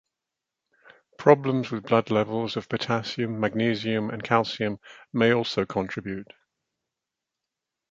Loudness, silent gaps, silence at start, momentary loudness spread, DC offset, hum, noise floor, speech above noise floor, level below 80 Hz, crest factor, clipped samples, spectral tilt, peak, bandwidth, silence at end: -25 LUFS; none; 1.2 s; 11 LU; under 0.1%; none; -86 dBFS; 62 dB; -62 dBFS; 24 dB; under 0.1%; -6.5 dB/octave; -2 dBFS; 7.6 kHz; 1.7 s